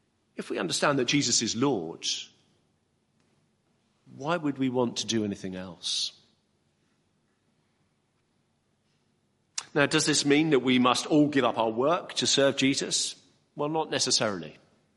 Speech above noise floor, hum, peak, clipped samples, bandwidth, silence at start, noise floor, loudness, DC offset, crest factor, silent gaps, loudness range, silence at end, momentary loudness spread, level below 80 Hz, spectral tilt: 46 dB; none; -6 dBFS; under 0.1%; 11.5 kHz; 0.4 s; -72 dBFS; -26 LUFS; under 0.1%; 22 dB; none; 12 LU; 0.45 s; 13 LU; -72 dBFS; -3 dB/octave